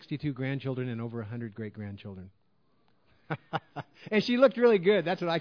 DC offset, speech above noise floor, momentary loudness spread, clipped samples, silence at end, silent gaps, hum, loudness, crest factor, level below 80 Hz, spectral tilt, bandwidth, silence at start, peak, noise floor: under 0.1%; 42 dB; 20 LU; under 0.1%; 0 s; none; none; -29 LUFS; 20 dB; -72 dBFS; -7.5 dB/octave; 5.4 kHz; 0 s; -10 dBFS; -71 dBFS